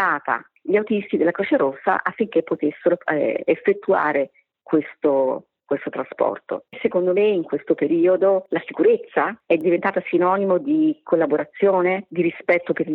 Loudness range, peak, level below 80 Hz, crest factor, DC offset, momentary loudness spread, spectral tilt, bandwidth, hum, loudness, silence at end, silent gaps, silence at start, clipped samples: 3 LU; -4 dBFS; -72 dBFS; 16 dB; under 0.1%; 7 LU; -9.5 dB/octave; 4.3 kHz; none; -21 LUFS; 0 s; none; 0 s; under 0.1%